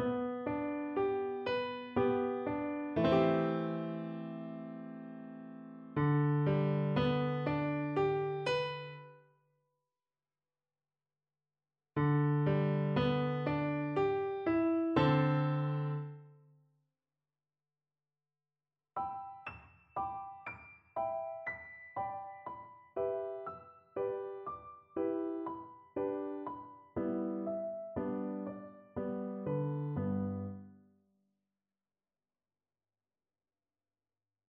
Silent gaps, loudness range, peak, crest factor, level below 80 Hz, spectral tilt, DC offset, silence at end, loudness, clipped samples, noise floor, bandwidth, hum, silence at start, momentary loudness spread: none; 12 LU; -16 dBFS; 20 dB; -66 dBFS; -9 dB/octave; under 0.1%; 3.8 s; -36 LUFS; under 0.1%; under -90 dBFS; 6.8 kHz; none; 0 s; 16 LU